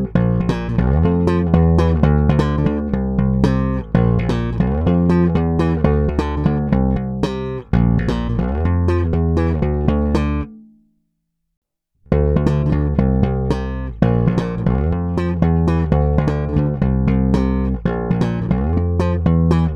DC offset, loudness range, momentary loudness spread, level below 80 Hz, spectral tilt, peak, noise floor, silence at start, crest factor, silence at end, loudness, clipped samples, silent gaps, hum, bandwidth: under 0.1%; 4 LU; 5 LU; -24 dBFS; -9.5 dB/octave; 0 dBFS; -72 dBFS; 0 s; 16 dB; 0 s; -18 LUFS; under 0.1%; 11.57-11.62 s; none; 7.6 kHz